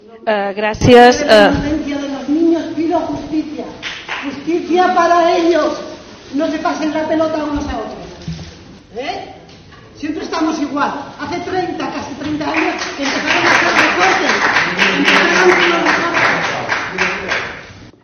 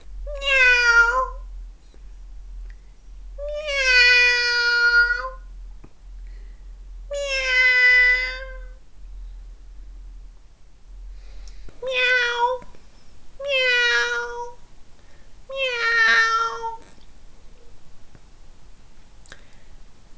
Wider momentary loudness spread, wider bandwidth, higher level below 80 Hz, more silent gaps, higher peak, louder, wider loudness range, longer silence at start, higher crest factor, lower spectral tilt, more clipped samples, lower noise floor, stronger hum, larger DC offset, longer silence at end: second, 17 LU vs 21 LU; first, 12.5 kHz vs 8 kHz; about the same, -42 dBFS vs -40 dBFS; neither; first, 0 dBFS vs -4 dBFS; first, -14 LUFS vs -17 LUFS; first, 11 LU vs 7 LU; about the same, 0.1 s vs 0.05 s; about the same, 16 dB vs 20 dB; first, -4 dB/octave vs -0.5 dB/octave; first, 0.1% vs under 0.1%; second, -39 dBFS vs -45 dBFS; neither; neither; about the same, 0.15 s vs 0.05 s